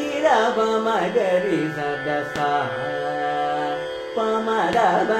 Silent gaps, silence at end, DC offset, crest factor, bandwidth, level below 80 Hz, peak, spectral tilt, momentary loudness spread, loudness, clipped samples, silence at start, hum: none; 0 s; under 0.1%; 14 dB; 14.5 kHz; -58 dBFS; -6 dBFS; -5 dB/octave; 7 LU; -22 LUFS; under 0.1%; 0 s; none